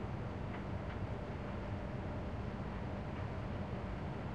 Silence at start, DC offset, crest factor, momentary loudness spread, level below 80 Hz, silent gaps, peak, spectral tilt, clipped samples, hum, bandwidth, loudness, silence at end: 0 s; 0.1%; 12 dB; 1 LU; -50 dBFS; none; -30 dBFS; -8 dB/octave; under 0.1%; none; 9.2 kHz; -43 LUFS; 0 s